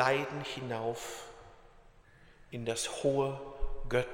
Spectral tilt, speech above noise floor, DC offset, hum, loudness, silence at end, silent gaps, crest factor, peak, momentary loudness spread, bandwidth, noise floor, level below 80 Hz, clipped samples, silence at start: -4 dB/octave; 25 dB; under 0.1%; none; -35 LUFS; 0 s; none; 20 dB; -14 dBFS; 15 LU; 16 kHz; -59 dBFS; -46 dBFS; under 0.1%; 0 s